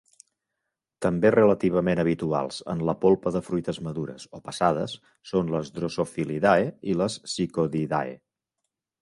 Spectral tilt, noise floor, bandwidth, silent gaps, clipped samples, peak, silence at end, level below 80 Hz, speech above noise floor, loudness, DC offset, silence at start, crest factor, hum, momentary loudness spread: -6.5 dB/octave; -84 dBFS; 11.5 kHz; none; under 0.1%; -6 dBFS; 0.85 s; -56 dBFS; 59 dB; -25 LUFS; under 0.1%; 1 s; 20 dB; none; 12 LU